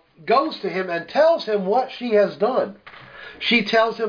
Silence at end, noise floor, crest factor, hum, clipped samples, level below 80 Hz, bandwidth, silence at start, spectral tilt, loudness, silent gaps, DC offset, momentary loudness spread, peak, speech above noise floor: 0 s; -41 dBFS; 16 dB; none; under 0.1%; -66 dBFS; 5.2 kHz; 0.2 s; -5.5 dB/octave; -20 LUFS; none; under 0.1%; 9 LU; -6 dBFS; 21 dB